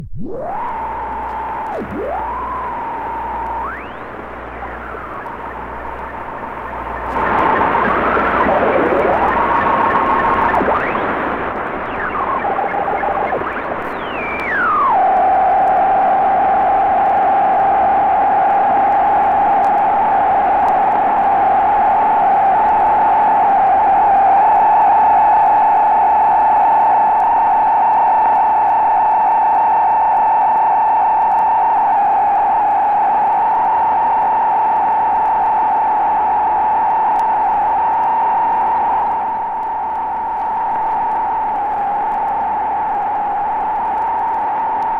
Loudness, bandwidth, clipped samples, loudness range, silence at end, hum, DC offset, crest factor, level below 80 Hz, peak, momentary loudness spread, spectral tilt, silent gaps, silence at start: -14 LUFS; 4.9 kHz; under 0.1%; 11 LU; 0 s; none; under 0.1%; 14 dB; -42 dBFS; 0 dBFS; 11 LU; -7 dB/octave; none; 0 s